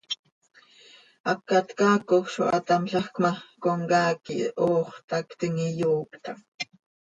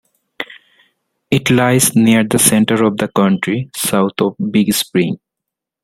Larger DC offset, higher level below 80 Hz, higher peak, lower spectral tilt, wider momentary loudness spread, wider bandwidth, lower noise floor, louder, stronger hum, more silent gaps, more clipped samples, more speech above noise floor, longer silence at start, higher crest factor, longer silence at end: neither; second, -70 dBFS vs -52 dBFS; second, -8 dBFS vs 0 dBFS; about the same, -5.5 dB/octave vs -4.5 dB/octave; about the same, 13 LU vs 14 LU; second, 9.4 kHz vs 16.5 kHz; second, -54 dBFS vs -81 dBFS; second, -26 LUFS vs -14 LUFS; neither; first, 0.19-0.24 s, 0.32-0.41 s, 1.20-1.24 s, 5.04-5.08 s, 6.48-6.58 s vs none; neither; second, 29 dB vs 68 dB; second, 0.1 s vs 0.4 s; about the same, 18 dB vs 16 dB; second, 0.45 s vs 0.65 s